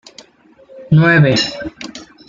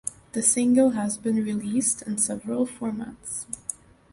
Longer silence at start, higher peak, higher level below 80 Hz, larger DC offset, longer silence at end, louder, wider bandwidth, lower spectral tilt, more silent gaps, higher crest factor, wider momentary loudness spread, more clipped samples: first, 0.75 s vs 0.05 s; first, -2 dBFS vs -6 dBFS; first, -48 dBFS vs -60 dBFS; neither; second, 0.25 s vs 0.4 s; first, -12 LUFS vs -25 LUFS; second, 7.4 kHz vs 11.5 kHz; first, -6 dB/octave vs -4.5 dB/octave; neither; second, 14 dB vs 20 dB; first, 20 LU vs 14 LU; neither